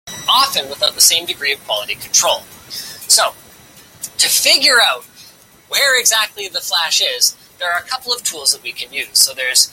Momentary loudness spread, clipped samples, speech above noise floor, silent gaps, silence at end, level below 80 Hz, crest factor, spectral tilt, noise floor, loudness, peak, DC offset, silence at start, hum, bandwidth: 13 LU; under 0.1%; 28 dB; none; 0.05 s; -60 dBFS; 16 dB; 2 dB/octave; -43 dBFS; -13 LUFS; 0 dBFS; under 0.1%; 0.05 s; none; 17 kHz